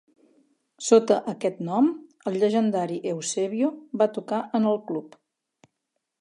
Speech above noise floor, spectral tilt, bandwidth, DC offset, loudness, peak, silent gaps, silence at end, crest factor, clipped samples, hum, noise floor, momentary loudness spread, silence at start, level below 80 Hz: 57 dB; -5 dB/octave; 11.5 kHz; under 0.1%; -25 LUFS; -4 dBFS; none; 1.15 s; 22 dB; under 0.1%; none; -81 dBFS; 10 LU; 0.8 s; -82 dBFS